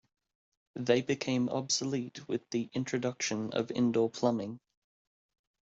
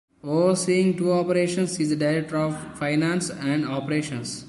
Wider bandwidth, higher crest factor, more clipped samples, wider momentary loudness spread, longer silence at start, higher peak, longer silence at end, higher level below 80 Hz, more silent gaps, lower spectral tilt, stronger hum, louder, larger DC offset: second, 8 kHz vs 11.5 kHz; first, 22 dB vs 14 dB; neither; first, 9 LU vs 6 LU; first, 0.75 s vs 0.25 s; about the same, -12 dBFS vs -10 dBFS; first, 1.2 s vs 0 s; second, -74 dBFS vs -60 dBFS; neither; about the same, -5 dB/octave vs -5.5 dB/octave; neither; second, -32 LUFS vs -24 LUFS; neither